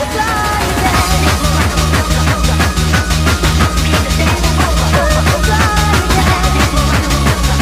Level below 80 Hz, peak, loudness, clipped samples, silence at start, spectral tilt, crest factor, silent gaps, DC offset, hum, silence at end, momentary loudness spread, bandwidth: -16 dBFS; 0 dBFS; -12 LUFS; under 0.1%; 0 s; -4.5 dB/octave; 12 dB; none; under 0.1%; none; 0 s; 2 LU; 16 kHz